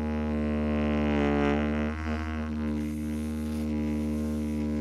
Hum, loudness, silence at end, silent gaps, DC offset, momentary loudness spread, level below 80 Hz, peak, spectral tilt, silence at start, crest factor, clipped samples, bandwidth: none; -29 LUFS; 0 s; none; under 0.1%; 6 LU; -36 dBFS; -14 dBFS; -7.5 dB/octave; 0 s; 14 dB; under 0.1%; 13.5 kHz